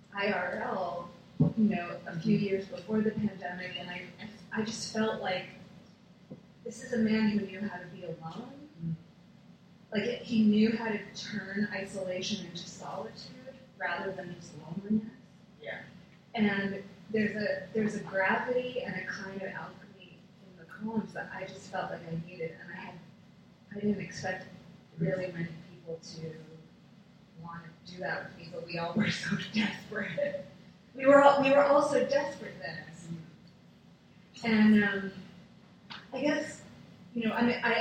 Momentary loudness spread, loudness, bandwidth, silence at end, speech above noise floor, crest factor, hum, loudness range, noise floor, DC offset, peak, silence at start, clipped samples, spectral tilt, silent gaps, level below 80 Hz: 21 LU; -31 LUFS; 9 kHz; 0 s; 27 dB; 26 dB; none; 13 LU; -58 dBFS; under 0.1%; -8 dBFS; 0.1 s; under 0.1%; -6 dB/octave; none; -68 dBFS